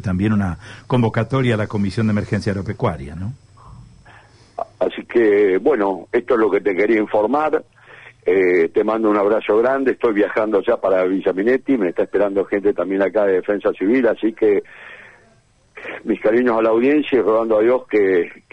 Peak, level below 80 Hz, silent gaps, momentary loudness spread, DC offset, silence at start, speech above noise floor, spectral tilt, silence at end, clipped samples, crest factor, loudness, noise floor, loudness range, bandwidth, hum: -6 dBFS; -50 dBFS; none; 9 LU; under 0.1%; 0 s; 38 dB; -8 dB/octave; 0.2 s; under 0.1%; 12 dB; -18 LUFS; -55 dBFS; 4 LU; 10 kHz; none